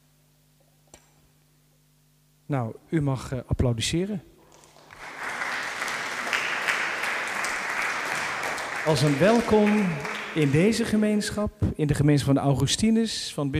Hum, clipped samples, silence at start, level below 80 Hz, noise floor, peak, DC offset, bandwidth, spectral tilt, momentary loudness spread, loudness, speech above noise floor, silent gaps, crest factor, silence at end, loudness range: 50 Hz at -55 dBFS; under 0.1%; 2.5 s; -46 dBFS; -62 dBFS; -8 dBFS; under 0.1%; 15.5 kHz; -5 dB/octave; 10 LU; -25 LUFS; 39 dB; none; 18 dB; 0 s; 7 LU